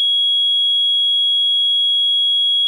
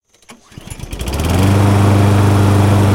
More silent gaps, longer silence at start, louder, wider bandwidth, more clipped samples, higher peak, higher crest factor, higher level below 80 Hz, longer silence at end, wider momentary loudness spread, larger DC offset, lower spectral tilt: neither; second, 0 s vs 0.3 s; about the same, -12 LUFS vs -12 LUFS; second, 10.5 kHz vs 16.5 kHz; neither; second, -12 dBFS vs 0 dBFS; second, 2 dB vs 12 dB; second, -86 dBFS vs -28 dBFS; about the same, 0 s vs 0 s; second, 0 LU vs 17 LU; neither; second, 5.5 dB/octave vs -6.5 dB/octave